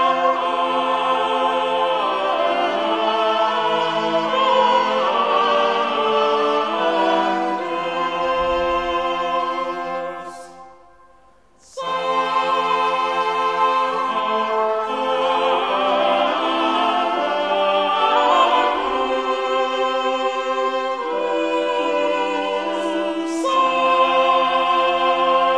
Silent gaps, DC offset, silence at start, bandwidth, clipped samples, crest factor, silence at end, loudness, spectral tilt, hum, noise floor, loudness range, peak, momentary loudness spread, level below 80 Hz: none; 0.2%; 0 s; 11 kHz; under 0.1%; 14 dB; 0 s; -19 LUFS; -3.5 dB/octave; none; -54 dBFS; 5 LU; -4 dBFS; 6 LU; -54 dBFS